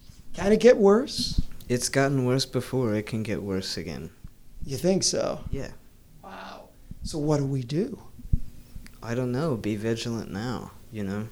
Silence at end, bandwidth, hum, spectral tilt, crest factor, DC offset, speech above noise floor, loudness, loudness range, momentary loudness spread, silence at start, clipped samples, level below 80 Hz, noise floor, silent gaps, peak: 0 s; 17.5 kHz; none; -5 dB/octave; 22 dB; under 0.1%; 23 dB; -26 LUFS; 8 LU; 21 LU; 0.1 s; under 0.1%; -40 dBFS; -48 dBFS; none; -4 dBFS